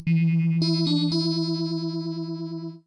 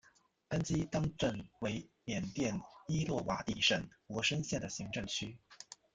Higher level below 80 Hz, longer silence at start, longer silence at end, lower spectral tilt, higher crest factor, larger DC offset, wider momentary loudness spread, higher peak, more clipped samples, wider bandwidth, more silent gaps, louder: second, -66 dBFS vs -60 dBFS; second, 0 s vs 0.5 s; about the same, 0.1 s vs 0.2 s; first, -7.5 dB/octave vs -4.5 dB/octave; second, 12 dB vs 22 dB; neither; about the same, 10 LU vs 12 LU; first, -12 dBFS vs -16 dBFS; neither; about the same, 9.4 kHz vs 9.4 kHz; neither; first, -25 LUFS vs -37 LUFS